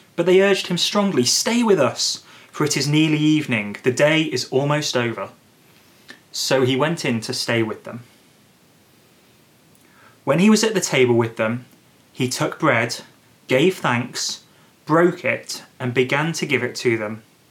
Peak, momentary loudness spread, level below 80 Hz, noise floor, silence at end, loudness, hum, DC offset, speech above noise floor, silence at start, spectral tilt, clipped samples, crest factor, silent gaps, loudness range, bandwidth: -2 dBFS; 14 LU; -72 dBFS; -54 dBFS; 0.3 s; -19 LUFS; none; under 0.1%; 35 dB; 0.2 s; -4 dB/octave; under 0.1%; 18 dB; none; 5 LU; 17.5 kHz